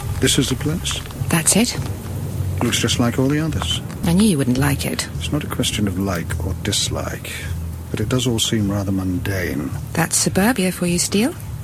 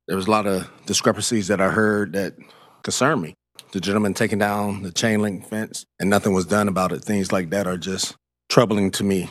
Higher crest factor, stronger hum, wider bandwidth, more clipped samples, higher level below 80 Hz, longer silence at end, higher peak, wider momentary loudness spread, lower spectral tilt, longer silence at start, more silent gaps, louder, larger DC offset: about the same, 18 dB vs 20 dB; neither; about the same, 16.5 kHz vs 15 kHz; neither; first, -38 dBFS vs -58 dBFS; about the same, 0 s vs 0 s; about the same, -2 dBFS vs 0 dBFS; about the same, 9 LU vs 9 LU; about the same, -4 dB/octave vs -4.5 dB/octave; about the same, 0 s vs 0.1 s; neither; about the same, -20 LUFS vs -21 LUFS; neither